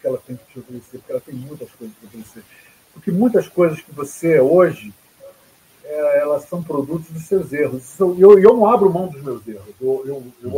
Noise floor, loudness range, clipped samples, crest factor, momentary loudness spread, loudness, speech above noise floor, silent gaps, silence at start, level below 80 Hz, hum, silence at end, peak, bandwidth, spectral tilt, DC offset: -52 dBFS; 8 LU; 0.1%; 18 dB; 24 LU; -16 LUFS; 35 dB; none; 0.05 s; -60 dBFS; none; 0 s; 0 dBFS; 16 kHz; -7.5 dB/octave; under 0.1%